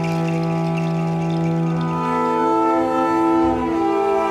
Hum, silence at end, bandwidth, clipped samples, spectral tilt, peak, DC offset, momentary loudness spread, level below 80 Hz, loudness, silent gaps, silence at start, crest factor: none; 0 s; 10 kHz; under 0.1%; -8 dB/octave; -8 dBFS; under 0.1%; 4 LU; -46 dBFS; -19 LUFS; none; 0 s; 10 dB